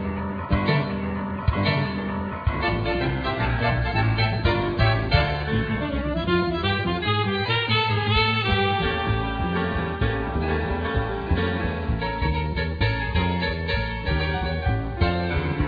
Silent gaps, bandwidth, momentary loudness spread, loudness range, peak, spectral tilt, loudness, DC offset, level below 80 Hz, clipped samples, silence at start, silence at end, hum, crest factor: none; 5 kHz; 5 LU; 3 LU; -6 dBFS; -8.5 dB/octave; -24 LUFS; under 0.1%; -32 dBFS; under 0.1%; 0 s; 0 s; none; 18 dB